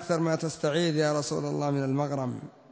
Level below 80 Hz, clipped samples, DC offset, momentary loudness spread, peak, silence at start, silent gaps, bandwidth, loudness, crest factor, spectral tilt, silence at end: -68 dBFS; under 0.1%; under 0.1%; 6 LU; -14 dBFS; 0 s; none; 8 kHz; -28 LUFS; 14 dB; -5.5 dB/octave; 0.2 s